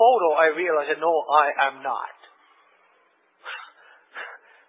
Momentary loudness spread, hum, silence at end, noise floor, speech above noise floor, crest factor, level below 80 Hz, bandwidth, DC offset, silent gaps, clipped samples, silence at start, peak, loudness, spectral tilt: 20 LU; none; 0.35 s; -63 dBFS; 41 dB; 20 dB; under -90 dBFS; 4 kHz; under 0.1%; none; under 0.1%; 0 s; -4 dBFS; -21 LUFS; -6 dB/octave